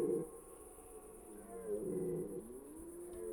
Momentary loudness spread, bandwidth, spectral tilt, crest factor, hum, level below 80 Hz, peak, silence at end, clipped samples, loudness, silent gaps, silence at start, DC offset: 14 LU; over 20 kHz; -7.5 dB/octave; 18 dB; none; -66 dBFS; -26 dBFS; 0 s; under 0.1%; -46 LUFS; none; 0 s; under 0.1%